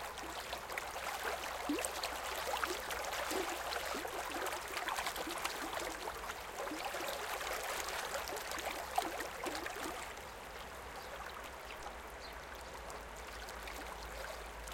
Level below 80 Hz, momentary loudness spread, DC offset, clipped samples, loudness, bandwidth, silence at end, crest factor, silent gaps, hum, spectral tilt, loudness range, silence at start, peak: -58 dBFS; 9 LU; under 0.1%; under 0.1%; -41 LUFS; 17 kHz; 0 s; 26 dB; none; none; -2 dB/octave; 8 LU; 0 s; -16 dBFS